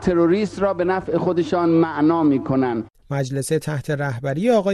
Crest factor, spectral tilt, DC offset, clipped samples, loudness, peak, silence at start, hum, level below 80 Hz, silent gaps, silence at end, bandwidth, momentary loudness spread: 14 dB; -7 dB/octave; under 0.1%; under 0.1%; -20 LUFS; -6 dBFS; 0 s; none; -48 dBFS; none; 0 s; 13.5 kHz; 7 LU